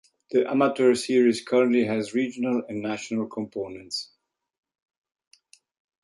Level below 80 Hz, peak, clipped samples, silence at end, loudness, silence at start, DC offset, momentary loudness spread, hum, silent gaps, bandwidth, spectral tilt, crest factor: -70 dBFS; -8 dBFS; under 0.1%; 2 s; -25 LUFS; 0.3 s; under 0.1%; 12 LU; none; none; 11.5 kHz; -5 dB/octave; 18 dB